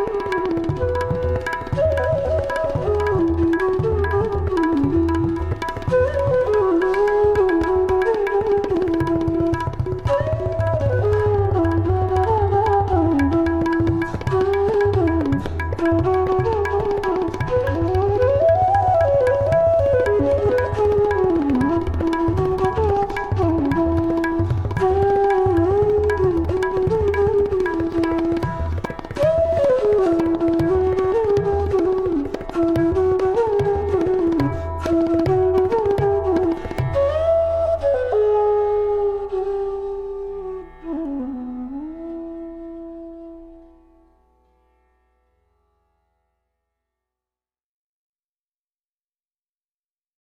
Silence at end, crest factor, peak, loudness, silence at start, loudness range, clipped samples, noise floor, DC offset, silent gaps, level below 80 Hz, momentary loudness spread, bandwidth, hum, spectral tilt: 6.65 s; 12 dB; -6 dBFS; -19 LUFS; 0 s; 4 LU; under 0.1%; under -90 dBFS; under 0.1%; none; -34 dBFS; 8 LU; 11 kHz; 60 Hz at -50 dBFS; -8.5 dB/octave